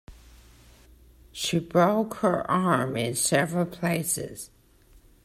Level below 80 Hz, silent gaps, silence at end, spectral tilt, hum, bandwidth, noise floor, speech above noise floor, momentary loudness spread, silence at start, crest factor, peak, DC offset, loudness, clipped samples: -56 dBFS; none; 0.8 s; -4.5 dB/octave; none; 16 kHz; -56 dBFS; 31 dB; 13 LU; 0.1 s; 20 dB; -8 dBFS; under 0.1%; -25 LUFS; under 0.1%